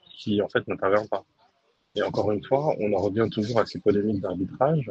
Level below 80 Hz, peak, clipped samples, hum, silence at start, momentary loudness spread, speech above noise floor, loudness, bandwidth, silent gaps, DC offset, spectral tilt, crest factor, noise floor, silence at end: -60 dBFS; -6 dBFS; under 0.1%; none; 0.15 s; 6 LU; 43 dB; -26 LUFS; 8 kHz; none; under 0.1%; -7.5 dB/octave; 18 dB; -67 dBFS; 0 s